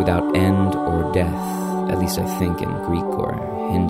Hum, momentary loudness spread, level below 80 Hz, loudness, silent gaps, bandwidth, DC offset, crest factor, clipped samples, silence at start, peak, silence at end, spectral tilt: none; 6 LU; -38 dBFS; -21 LUFS; none; 16 kHz; under 0.1%; 16 dB; under 0.1%; 0 s; -4 dBFS; 0 s; -7 dB/octave